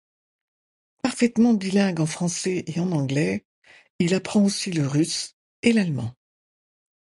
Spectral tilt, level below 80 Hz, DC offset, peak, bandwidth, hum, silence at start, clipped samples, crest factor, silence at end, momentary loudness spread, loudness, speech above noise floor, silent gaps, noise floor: -5.5 dB/octave; -60 dBFS; under 0.1%; -6 dBFS; 11.5 kHz; none; 1.05 s; under 0.1%; 18 dB; 0.95 s; 9 LU; -23 LUFS; over 68 dB; 3.45-3.62 s, 3.90-3.99 s, 5.33-5.63 s; under -90 dBFS